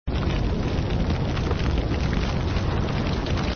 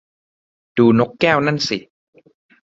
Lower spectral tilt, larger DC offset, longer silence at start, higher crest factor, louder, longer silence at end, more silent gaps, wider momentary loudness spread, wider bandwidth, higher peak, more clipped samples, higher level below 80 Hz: about the same, -7 dB/octave vs -6 dB/octave; neither; second, 0.05 s vs 0.75 s; about the same, 14 dB vs 18 dB; second, -25 LUFS vs -17 LUFS; second, 0 s vs 0.9 s; neither; second, 1 LU vs 11 LU; second, 6.8 kHz vs 7.8 kHz; second, -10 dBFS vs 0 dBFS; neither; first, -28 dBFS vs -56 dBFS